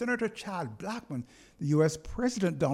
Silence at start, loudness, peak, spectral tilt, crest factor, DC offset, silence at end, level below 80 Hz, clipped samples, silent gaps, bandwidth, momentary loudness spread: 0 s; -32 LUFS; -14 dBFS; -6 dB/octave; 16 dB; under 0.1%; 0 s; -52 dBFS; under 0.1%; none; 13.5 kHz; 13 LU